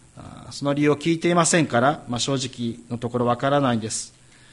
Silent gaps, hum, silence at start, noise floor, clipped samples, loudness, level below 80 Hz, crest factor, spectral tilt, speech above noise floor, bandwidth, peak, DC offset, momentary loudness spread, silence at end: none; none; 0.15 s; -41 dBFS; under 0.1%; -22 LUFS; -56 dBFS; 18 dB; -4.5 dB/octave; 19 dB; 11.5 kHz; -4 dBFS; under 0.1%; 12 LU; 0.45 s